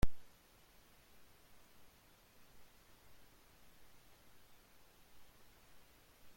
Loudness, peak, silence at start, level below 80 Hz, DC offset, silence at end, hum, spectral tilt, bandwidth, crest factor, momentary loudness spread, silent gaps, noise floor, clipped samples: -61 LUFS; -18 dBFS; 0 s; -54 dBFS; under 0.1%; 0.55 s; none; -5.5 dB/octave; 16.5 kHz; 24 dB; 1 LU; none; -66 dBFS; under 0.1%